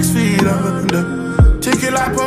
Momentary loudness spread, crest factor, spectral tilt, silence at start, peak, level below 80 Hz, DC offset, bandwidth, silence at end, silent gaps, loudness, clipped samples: 4 LU; 12 dB; -5.5 dB/octave; 0 s; -2 dBFS; -20 dBFS; under 0.1%; 15.5 kHz; 0 s; none; -15 LUFS; under 0.1%